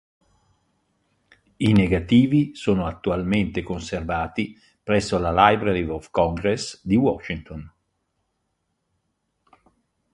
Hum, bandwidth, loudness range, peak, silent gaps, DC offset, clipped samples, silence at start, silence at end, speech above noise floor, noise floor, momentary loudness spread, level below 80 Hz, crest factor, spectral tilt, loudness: none; 11.5 kHz; 6 LU; 0 dBFS; none; under 0.1%; under 0.1%; 1.6 s; 2.45 s; 53 dB; -75 dBFS; 13 LU; -42 dBFS; 22 dB; -6.5 dB/octave; -22 LUFS